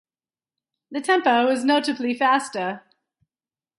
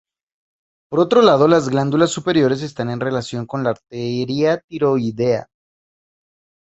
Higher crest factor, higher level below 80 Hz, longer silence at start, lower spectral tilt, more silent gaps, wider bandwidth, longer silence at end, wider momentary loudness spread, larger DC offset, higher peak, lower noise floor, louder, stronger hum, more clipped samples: about the same, 16 dB vs 18 dB; second, -78 dBFS vs -56 dBFS; about the same, 0.9 s vs 0.9 s; second, -3.5 dB/octave vs -6 dB/octave; second, none vs 4.64-4.68 s; first, 11.5 kHz vs 8.2 kHz; second, 1 s vs 1.2 s; about the same, 11 LU vs 11 LU; neither; second, -8 dBFS vs -2 dBFS; about the same, under -90 dBFS vs under -90 dBFS; second, -21 LUFS vs -18 LUFS; neither; neither